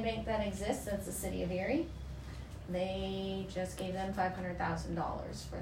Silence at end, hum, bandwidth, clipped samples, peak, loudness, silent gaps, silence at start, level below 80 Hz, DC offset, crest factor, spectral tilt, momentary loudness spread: 0 s; none; 16 kHz; under 0.1%; -20 dBFS; -38 LUFS; none; 0 s; -48 dBFS; under 0.1%; 18 dB; -5.5 dB/octave; 8 LU